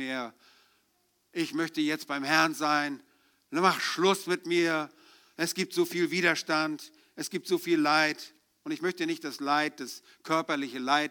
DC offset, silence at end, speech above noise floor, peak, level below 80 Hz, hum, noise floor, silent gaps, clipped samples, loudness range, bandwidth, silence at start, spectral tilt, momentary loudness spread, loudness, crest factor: under 0.1%; 0 s; 43 dB; -8 dBFS; -84 dBFS; none; -72 dBFS; none; under 0.1%; 3 LU; 19.5 kHz; 0 s; -3.5 dB/octave; 16 LU; -28 LUFS; 22 dB